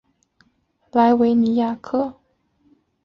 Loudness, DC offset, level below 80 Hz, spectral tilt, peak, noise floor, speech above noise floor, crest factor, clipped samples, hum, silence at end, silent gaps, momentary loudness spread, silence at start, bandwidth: -19 LUFS; under 0.1%; -60 dBFS; -8 dB/octave; -4 dBFS; -64 dBFS; 47 dB; 16 dB; under 0.1%; none; 0.9 s; none; 9 LU; 0.95 s; 5.8 kHz